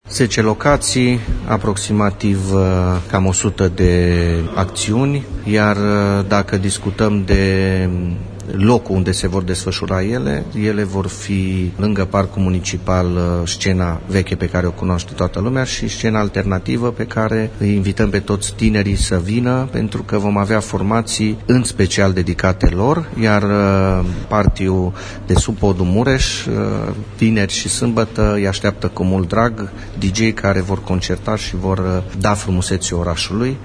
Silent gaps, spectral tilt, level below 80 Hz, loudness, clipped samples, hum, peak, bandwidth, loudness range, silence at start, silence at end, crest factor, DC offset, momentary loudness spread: none; -5.5 dB/octave; -28 dBFS; -17 LUFS; under 0.1%; none; 0 dBFS; 10.5 kHz; 3 LU; 0.05 s; 0 s; 16 dB; under 0.1%; 5 LU